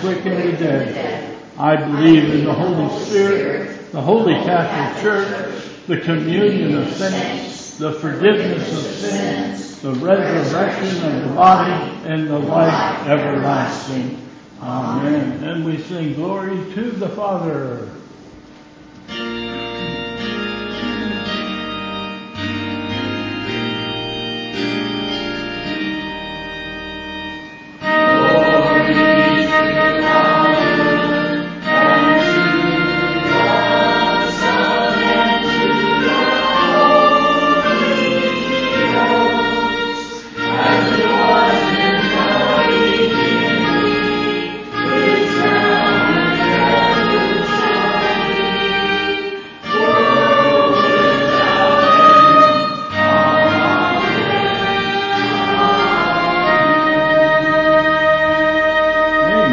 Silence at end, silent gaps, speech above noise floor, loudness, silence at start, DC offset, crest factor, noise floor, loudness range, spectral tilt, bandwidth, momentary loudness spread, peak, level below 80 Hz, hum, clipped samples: 0 s; none; 24 dB; -15 LUFS; 0 s; under 0.1%; 14 dB; -41 dBFS; 11 LU; -5.5 dB/octave; 7.8 kHz; 12 LU; 0 dBFS; -46 dBFS; none; under 0.1%